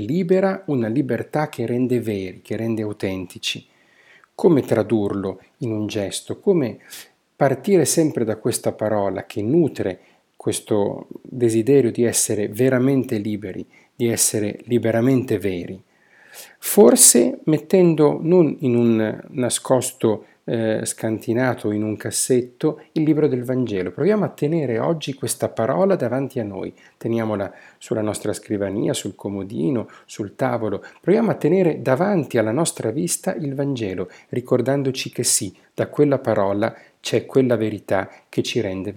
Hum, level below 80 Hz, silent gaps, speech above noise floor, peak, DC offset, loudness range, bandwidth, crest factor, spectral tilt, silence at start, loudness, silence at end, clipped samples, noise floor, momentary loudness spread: none; -66 dBFS; none; 33 dB; 0 dBFS; under 0.1%; 7 LU; 18.5 kHz; 20 dB; -5 dB/octave; 0 s; -20 LUFS; 0 s; under 0.1%; -53 dBFS; 11 LU